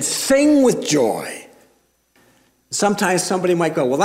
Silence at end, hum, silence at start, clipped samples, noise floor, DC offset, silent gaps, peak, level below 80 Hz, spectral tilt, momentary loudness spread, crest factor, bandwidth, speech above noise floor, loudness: 0 s; none; 0 s; under 0.1%; -60 dBFS; under 0.1%; none; -4 dBFS; -58 dBFS; -4 dB/octave; 12 LU; 16 dB; 16 kHz; 43 dB; -17 LUFS